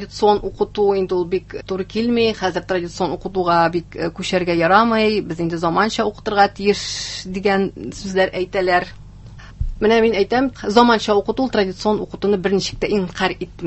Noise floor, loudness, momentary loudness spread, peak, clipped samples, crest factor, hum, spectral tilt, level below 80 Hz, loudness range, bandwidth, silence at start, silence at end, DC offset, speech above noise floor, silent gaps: -38 dBFS; -18 LUFS; 9 LU; 0 dBFS; under 0.1%; 18 dB; 50 Hz at -40 dBFS; -5 dB/octave; -40 dBFS; 3 LU; 8.4 kHz; 0 s; 0 s; under 0.1%; 20 dB; none